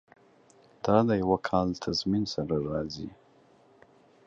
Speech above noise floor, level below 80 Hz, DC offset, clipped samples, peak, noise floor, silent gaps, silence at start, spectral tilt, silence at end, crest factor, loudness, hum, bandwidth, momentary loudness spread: 33 dB; -54 dBFS; under 0.1%; under 0.1%; -8 dBFS; -60 dBFS; none; 0.85 s; -6.5 dB/octave; 1.2 s; 22 dB; -28 LUFS; none; 7.6 kHz; 12 LU